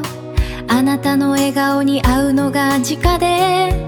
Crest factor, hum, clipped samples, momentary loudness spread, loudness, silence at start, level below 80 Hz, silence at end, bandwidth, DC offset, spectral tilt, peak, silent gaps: 14 dB; none; under 0.1%; 6 LU; -15 LUFS; 0 s; -26 dBFS; 0 s; 19.5 kHz; under 0.1%; -5 dB/octave; 0 dBFS; none